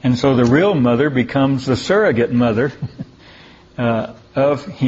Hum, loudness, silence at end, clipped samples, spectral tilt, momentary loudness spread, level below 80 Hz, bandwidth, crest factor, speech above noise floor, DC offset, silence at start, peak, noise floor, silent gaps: none; -16 LUFS; 0 s; under 0.1%; -7 dB/octave; 16 LU; -48 dBFS; 8 kHz; 16 dB; 28 dB; under 0.1%; 0.05 s; 0 dBFS; -43 dBFS; none